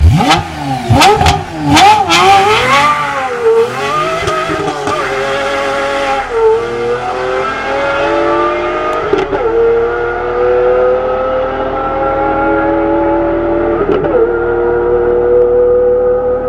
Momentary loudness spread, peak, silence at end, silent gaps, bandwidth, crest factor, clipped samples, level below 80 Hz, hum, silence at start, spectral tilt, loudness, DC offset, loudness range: 8 LU; 0 dBFS; 0 s; none; 15.5 kHz; 10 dB; under 0.1%; -28 dBFS; none; 0 s; -5 dB/octave; -11 LUFS; under 0.1%; 5 LU